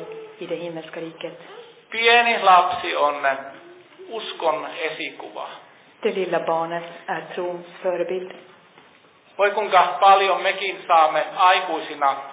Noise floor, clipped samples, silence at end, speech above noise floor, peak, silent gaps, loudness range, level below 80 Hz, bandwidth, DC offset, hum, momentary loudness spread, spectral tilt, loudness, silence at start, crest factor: -53 dBFS; under 0.1%; 0 s; 32 dB; -4 dBFS; none; 9 LU; -74 dBFS; 4 kHz; under 0.1%; none; 20 LU; -7 dB/octave; -20 LUFS; 0 s; 18 dB